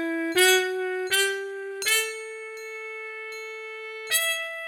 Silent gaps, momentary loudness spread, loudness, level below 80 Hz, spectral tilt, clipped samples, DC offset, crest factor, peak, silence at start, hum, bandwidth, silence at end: none; 16 LU; -24 LUFS; -78 dBFS; 0.5 dB/octave; under 0.1%; under 0.1%; 18 dB; -8 dBFS; 0 s; none; 19.5 kHz; 0 s